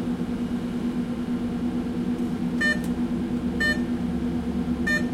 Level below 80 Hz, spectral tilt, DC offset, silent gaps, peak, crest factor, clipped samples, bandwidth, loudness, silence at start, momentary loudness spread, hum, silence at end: -42 dBFS; -6 dB/octave; under 0.1%; none; -12 dBFS; 14 dB; under 0.1%; 14 kHz; -26 LUFS; 0 s; 5 LU; none; 0 s